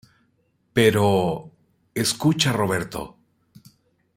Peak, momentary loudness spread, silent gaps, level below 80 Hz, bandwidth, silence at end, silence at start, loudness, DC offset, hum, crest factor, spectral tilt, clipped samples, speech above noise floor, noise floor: -4 dBFS; 15 LU; none; -56 dBFS; 16 kHz; 1.1 s; 0.75 s; -22 LUFS; under 0.1%; none; 20 dB; -4.5 dB/octave; under 0.1%; 46 dB; -67 dBFS